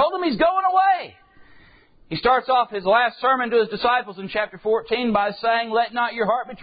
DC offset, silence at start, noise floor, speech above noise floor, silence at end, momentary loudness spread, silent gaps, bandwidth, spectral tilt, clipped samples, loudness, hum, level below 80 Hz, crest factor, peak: under 0.1%; 0 s; -52 dBFS; 31 dB; 0 s; 7 LU; none; 5 kHz; -9.5 dB/octave; under 0.1%; -21 LUFS; none; -56 dBFS; 14 dB; -6 dBFS